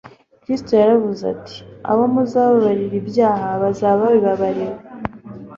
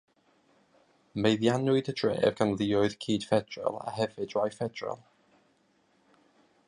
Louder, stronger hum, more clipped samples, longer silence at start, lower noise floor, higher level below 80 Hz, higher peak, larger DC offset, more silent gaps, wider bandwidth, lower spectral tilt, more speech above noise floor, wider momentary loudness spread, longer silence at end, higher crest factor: first, -17 LUFS vs -29 LUFS; neither; neither; second, 0.05 s vs 1.15 s; second, -36 dBFS vs -69 dBFS; first, -52 dBFS vs -64 dBFS; first, -2 dBFS vs -10 dBFS; neither; neither; second, 7.4 kHz vs 11 kHz; first, -8 dB/octave vs -6 dB/octave; second, 19 dB vs 40 dB; first, 16 LU vs 9 LU; second, 0 s vs 1.7 s; second, 16 dB vs 22 dB